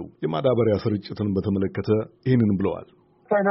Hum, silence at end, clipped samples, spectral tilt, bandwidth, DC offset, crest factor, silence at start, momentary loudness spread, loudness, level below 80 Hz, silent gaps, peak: none; 0 s; under 0.1%; -7.5 dB/octave; 5.8 kHz; under 0.1%; 16 dB; 0 s; 7 LU; -24 LUFS; -56 dBFS; none; -8 dBFS